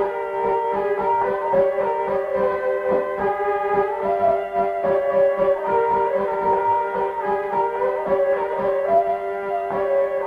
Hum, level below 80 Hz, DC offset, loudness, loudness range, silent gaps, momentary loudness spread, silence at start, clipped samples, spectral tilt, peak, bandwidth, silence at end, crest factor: none; -54 dBFS; under 0.1%; -21 LUFS; 1 LU; none; 4 LU; 0 s; under 0.1%; -7.5 dB/octave; -8 dBFS; 5.2 kHz; 0 s; 14 dB